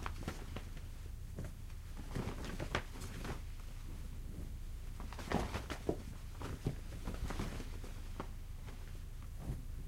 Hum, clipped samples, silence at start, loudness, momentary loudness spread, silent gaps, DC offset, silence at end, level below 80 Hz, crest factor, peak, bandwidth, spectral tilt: none; under 0.1%; 0 s; -46 LUFS; 9 LU; none; under 0.1%; 0 s; -46 dBFS; 24 dB; -20 dBFS; 16 kHz; -5.5 dB/octave